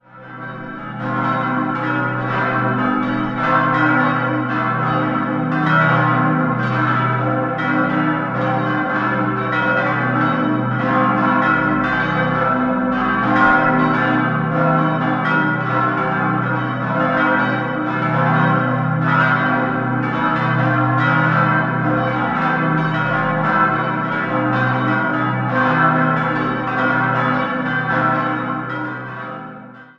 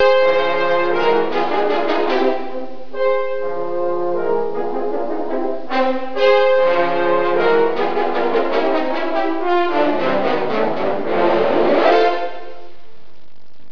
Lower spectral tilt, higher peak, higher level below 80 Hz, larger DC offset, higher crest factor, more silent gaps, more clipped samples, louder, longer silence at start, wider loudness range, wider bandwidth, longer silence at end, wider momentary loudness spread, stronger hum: first, -8.5 dB/octave vs -6 dB/octave; about the same, 0 dBFS vs -2 dBFS; first, -48 dBFS vs -62 dBFS; second, under 0.1% vs 7%; about the same, 16 dB vs 16 dB; neither; neither; about the same, -17 LUFS vs -18 LUFS; first, 0.15 s vs 0 s; about the same, 2 LU vs 4 LU; first, 7 kHz vs 5.4 kHz; second, 0.15 s vs 1.05 s; second, 5 LU vs 9 LU; neither